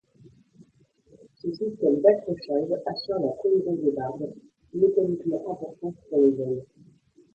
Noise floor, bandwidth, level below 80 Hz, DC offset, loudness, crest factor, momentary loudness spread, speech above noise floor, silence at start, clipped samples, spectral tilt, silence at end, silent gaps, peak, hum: -62 dBFS; 6.6 kHz; -68 dBFS; under 0.1%; -26 LUFS; 20 dB; 14 LU; 37 dB; 0.6 s; under 0.1%; -8.5 dB/octave; 0.7 s; none; -6 dBFS; none